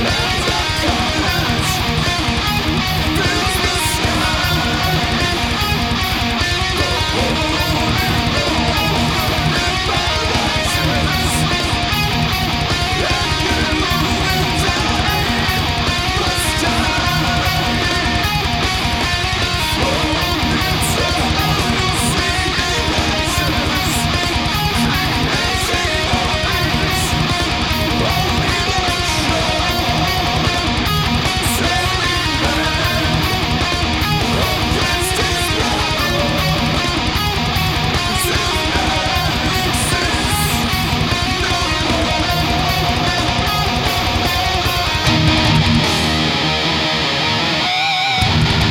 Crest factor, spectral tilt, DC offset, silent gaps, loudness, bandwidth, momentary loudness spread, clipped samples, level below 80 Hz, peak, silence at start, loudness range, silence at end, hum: 14 dB; -4 dB/octave; under 0.1%; none; -15 LUFS; 19 kHz; 1 LU; under 0.1%; -26 dBFS; -2 dBFS; 0 s; 1 LU; 0 s; none